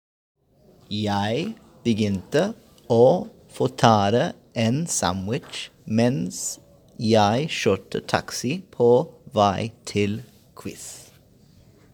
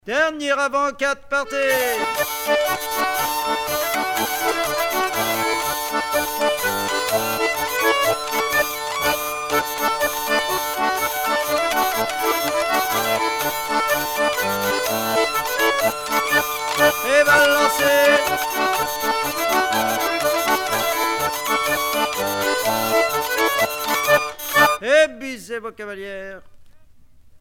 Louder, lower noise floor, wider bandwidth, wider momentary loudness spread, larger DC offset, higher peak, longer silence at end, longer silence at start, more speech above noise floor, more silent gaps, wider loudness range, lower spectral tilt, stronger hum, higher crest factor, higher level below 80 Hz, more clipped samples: second, -23 LUFS vs -19 LUFS; first, -55 dBFS vs -46 dBFS; about the same, 19.5 kHz vs over 20 kHz; first, 17 LU vs 6 LU; neither; about the same, 0 dBFS vs -2 dBFS; first, 0.9 s vs 0.05 s; first, 0.9 s vs 0.05 s; first, 34 dB vs 25 dB; neither; about the same, 3 LU vs 4 LU; first, -5 dB/octave vs -1.5 dB/octave; neither; about the same, 22 dB vs 18 dB; second, -58 dBFS vs -52 dBFS; neither